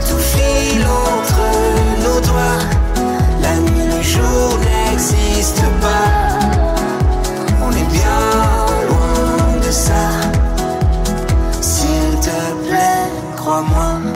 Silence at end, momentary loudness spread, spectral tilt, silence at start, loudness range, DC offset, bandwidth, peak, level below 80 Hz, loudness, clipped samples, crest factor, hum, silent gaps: 0 s; 3 LU; -5 dB/octave; 0 s; 2 LU; under 0.1%; 16 kHz; -4 dBFS; -18 dBFS; -15 LUFS; under 0.1%; 10 dB; none; none